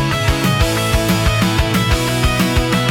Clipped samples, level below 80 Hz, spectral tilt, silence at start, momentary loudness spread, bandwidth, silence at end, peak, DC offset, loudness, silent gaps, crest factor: under 0.1%; -22 dBFS; -4.5 dB/octave; 0 s; 1 LU; 18 kHz; 0 s; -2 dBFS; under 0.1%; -15 LUFS; none; 12 dB